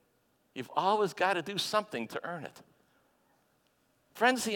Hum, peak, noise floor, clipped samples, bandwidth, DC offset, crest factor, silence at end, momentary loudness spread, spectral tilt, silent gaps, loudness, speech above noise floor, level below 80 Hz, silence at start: none; -12 dBFS; -72 dBFS; under 0.1%; 17.5 kHz; under 0.1%; 22 dB; 0 s; 15 LU; -3 dB/octave; none; -31 LUFS; 41 dB; -78 dBFS; 0.55 s